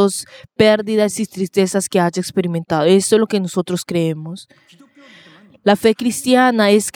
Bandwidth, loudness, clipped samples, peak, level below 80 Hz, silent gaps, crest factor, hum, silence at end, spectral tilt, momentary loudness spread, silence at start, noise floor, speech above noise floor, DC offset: 18.5 kHz; -16 LUFS; under 0.1%; 0 dBFS; -58 dBFS; none; 16 dB; none; 0.05 s; -4.5 dB/octave; 9 LU; 0 s; -46 dBFS; 30 dB; under 0.1%